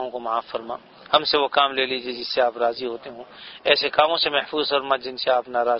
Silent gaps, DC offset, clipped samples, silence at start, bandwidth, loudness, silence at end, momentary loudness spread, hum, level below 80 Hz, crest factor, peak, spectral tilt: none; under 0.1%; under 0.1%; 0 s; 6 kHz; -22 LUFS; 0 s; 15 LU; none; -62 dBFS; 22 dB; 0 dBFS; -5 dB/octave